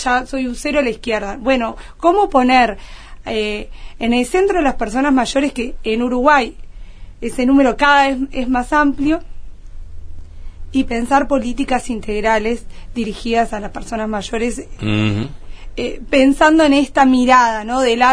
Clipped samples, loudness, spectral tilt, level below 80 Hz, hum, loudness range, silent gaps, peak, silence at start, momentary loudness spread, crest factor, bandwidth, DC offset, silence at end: under 0.1%; -16 LUFS; -5 dB/octave; -32 dBFS; none; 6 LU; none; 0 dBFS; 0 s; 13 LU; 16 dB; 11 kHz; 0.4%; 0 s